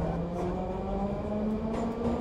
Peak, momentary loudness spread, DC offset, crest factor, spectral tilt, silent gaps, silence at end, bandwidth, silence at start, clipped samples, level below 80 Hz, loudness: -20 dBFS; 2 LU; under 0.1%; 12 dB; -8.5 dB/octave; none; 0 s; 10 kHz; 0 s; under 0.1%; -42 dBFS; -32 LUFS